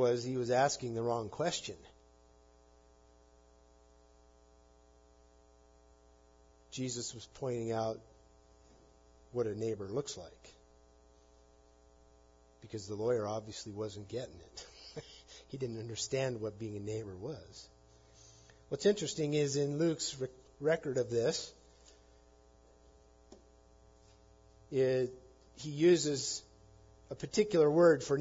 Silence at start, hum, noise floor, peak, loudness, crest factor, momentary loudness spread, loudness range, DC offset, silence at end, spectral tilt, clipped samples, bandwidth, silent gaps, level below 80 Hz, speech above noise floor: 0 s; none; -64 dBFS; -16 dBFS; -35 LUFS; 22 dB; 20 LU; 10 LU; under 0.1%; 0 s; -5 dB/octave; under 0.1%; 7.4 kHz; none; -66 dBFS; 30 dB